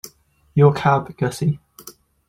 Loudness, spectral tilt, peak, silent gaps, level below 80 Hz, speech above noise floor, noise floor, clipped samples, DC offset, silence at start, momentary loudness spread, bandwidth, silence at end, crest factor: -19 LUFS; -7 dB/octave; -2 dBFS; none; -54 dBFS; 35 dB; -52 dBFS; under 0.1%; under 0.1%; 0.05 s; 14 LU; 16 kHz; 0.4 s; 18 dB